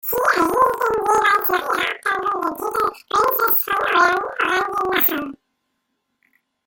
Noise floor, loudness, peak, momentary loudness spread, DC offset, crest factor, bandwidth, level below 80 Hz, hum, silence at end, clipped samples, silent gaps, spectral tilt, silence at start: -73 dBFS; -18 LUFS; -4 dBFS; 7 LU; under 0.1%; 16 dB; 17 kHz; -56 dBFS; none; 1.3 s; under 0.1%; none; -2.5 dB/octave; 0.05 s